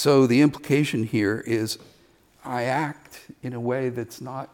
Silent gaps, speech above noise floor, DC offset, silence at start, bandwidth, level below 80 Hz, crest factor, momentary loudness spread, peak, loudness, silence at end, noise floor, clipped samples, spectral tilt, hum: none; 34 dB; under 0.1%; 0 s; 17.5 kHz; -64 dBFS; 16 dB; 17 LU; -8 dBFS; -24 LUFS; 0.1 s; -58 dBFS; under 0.1%; -6 dB/octave; none